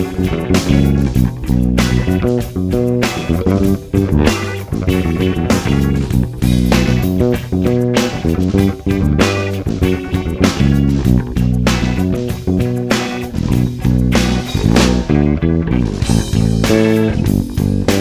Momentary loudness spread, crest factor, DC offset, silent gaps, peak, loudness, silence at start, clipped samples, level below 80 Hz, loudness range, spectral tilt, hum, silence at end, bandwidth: 4 LU; 14 dB; under 0.1%; none; 0 dBFS; -15 LUFS; 0 s; under 0.1%; -22 dBFS; 2 LU; -6.5 dB/octave; none; 0 s; 16 kHz